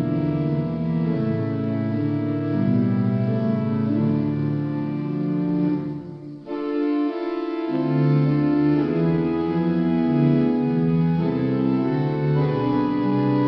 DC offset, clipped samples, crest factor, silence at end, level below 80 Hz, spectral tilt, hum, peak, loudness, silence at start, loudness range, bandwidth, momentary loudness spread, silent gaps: under 0.1%; under 0.1%; 14 dB; 0 s; -54 dBFS; -11 dB/octave; none; -8 dBFS; -22 LUFS; 0 s; 4 LU; 5.6 kHz; 6 LU; none